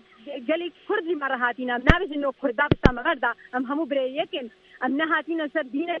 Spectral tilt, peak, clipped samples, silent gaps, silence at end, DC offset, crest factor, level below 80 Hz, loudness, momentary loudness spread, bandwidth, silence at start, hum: -7.5 dB/octave; 0 dBFS; under 0.1%; none; 0 s; under 0.1%; 24 dB; -36 dBFS; -25 LUFS; 10 LU; 7.6 kHz; 0.25 s; none